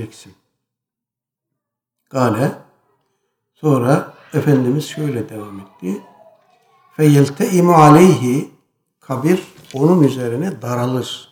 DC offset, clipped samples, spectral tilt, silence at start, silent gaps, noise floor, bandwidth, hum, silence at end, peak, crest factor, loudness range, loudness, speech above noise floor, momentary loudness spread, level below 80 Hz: under 0.1%; under 0.1%; -7 dB/octave; 0 s; none; -85 dBFS; 19 kHz; none; 0.1 s; 0 dBFS; 16 dB; 9 LU; -15 LUFS; 71 dB; 20 LU; -60 dBFS